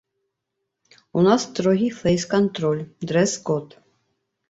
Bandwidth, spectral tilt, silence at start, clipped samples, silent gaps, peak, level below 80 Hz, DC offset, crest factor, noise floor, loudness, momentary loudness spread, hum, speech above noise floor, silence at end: 8 kHz; -5.5 dB/octave; 1.15 s; under 0.1%; none; -4 dBFS; -56 dBFS; under 0.1%; 20 dB; -80 dBFS; -21 LUFS; 8 LU; none; 59 dB; 0.85 s